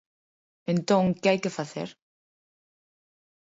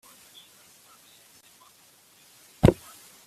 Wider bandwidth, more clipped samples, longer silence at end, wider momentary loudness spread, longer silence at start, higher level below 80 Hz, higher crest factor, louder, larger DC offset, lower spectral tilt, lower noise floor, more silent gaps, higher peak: second, 8 kHz vs 15 kHz; neither; first, 1.65 s vs 0.55 s; second, 15 LU vs 27 LU; second, 0.7 s vs 2.65 s; second, -68 dBFS vs -44 dBFS; second, 20 dB vs 28 dB; about the same, -26 LUFS vs -24 LUFS; neither; about the same, -6 dB/octave vs -7 dB/octave; first, under -90 dBFS vs -58 dBFS; neither; second, -8 dBFS vs -2 dBFS